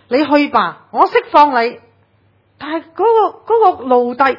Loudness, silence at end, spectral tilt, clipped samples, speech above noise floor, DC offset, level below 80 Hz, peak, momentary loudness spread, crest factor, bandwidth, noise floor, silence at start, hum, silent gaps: -13 LUFS; 0 s; -6 dB/octave; 0.2%; 42 dB; under 0.1%; -60 dBFS; 0 dBFS; 12 LU; 14 dB; 6 kHz; -55 dBFS; 0.1 s; none; none